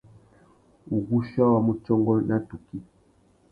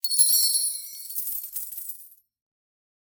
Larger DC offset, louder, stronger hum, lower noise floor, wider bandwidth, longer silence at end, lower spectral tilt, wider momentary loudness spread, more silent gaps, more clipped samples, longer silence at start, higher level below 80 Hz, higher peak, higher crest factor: neither; about the same, -24 LUFS vs -22 LUFS; neither; first, -61 dBFS vs -49 dBFS; second, 5 kHz vs over 20 kHz; second, 0.7 s vs 1 s; first, -11.5 dB/octave vs 5.5 dB/octave; about the same, 18 LU vs 18 LU; neither; neither; first, 0.9 s vs 0.05 s; first, -56 dBFS vs -80 dBFS; about the same, -8 dBFS vs -6 dBFS; about the same, 18 dB vs 22 dB